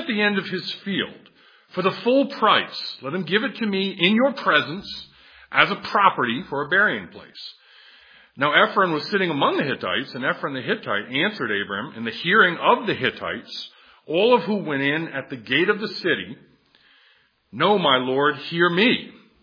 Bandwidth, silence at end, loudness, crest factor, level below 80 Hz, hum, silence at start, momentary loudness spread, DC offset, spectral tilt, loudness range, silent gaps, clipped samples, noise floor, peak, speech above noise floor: 5.2 kHz; 0.3 s; -21 LUFS; 22 dB; -68 dBFS; none; 0 s; 13 LU; under 0.1%; -6.5 dB/octave; 2 LU; none; under 0.1%; -60 dBFS; 0 dBFS; 38 dB